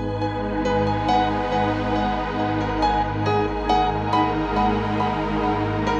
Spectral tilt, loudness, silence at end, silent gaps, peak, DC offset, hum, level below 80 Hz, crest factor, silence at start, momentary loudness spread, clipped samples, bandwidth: -7 dB/octave; -22 LUFS; 0 s; none; -8 dBFS; under 0.1%; 50 Hz at -55 dBFS; -34 dBFS; 14 dB; 0 s; 3 LU; under 0.1%; 8.6 kHz